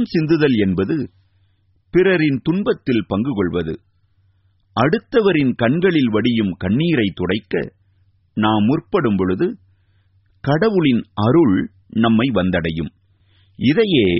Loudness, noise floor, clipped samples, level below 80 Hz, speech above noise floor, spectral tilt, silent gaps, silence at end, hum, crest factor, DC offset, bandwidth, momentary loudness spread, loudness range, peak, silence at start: -18 LUFS; -59 dBFS; under 0.1%; -46 dBFS; 43 dB; -5.5 dB/octave; none; 0 s; none; 16 dB; under 0.1%; 5.8 kHz; 9 LU; 2 LU; -2 dBFS; 0 s